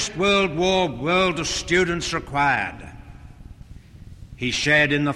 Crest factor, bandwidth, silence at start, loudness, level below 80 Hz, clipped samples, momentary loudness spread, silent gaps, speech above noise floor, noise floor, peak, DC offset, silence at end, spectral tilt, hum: 16 dB; 12.5 kHz; 0 s; -21 LUFS; -42 dBFS; under 0.1%; 10 LU; none; 22 dB; -43 dBFS; -6 dBFS; under 0.1%; 0 s; -4 dB/octave; none